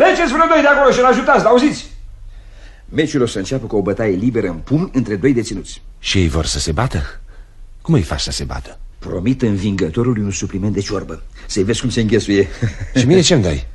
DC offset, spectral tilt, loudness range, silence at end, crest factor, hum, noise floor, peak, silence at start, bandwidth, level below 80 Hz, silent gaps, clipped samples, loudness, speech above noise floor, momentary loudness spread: under 0.1%; -5 dB/octave; 5 LU; 0 s; 16 dB; none; -37 dBFS; 0 dBFS; 0 s; 12 kHz; -32 dBFS; none; under 0.1%; -16 LUFS; 21 dB; 14 LU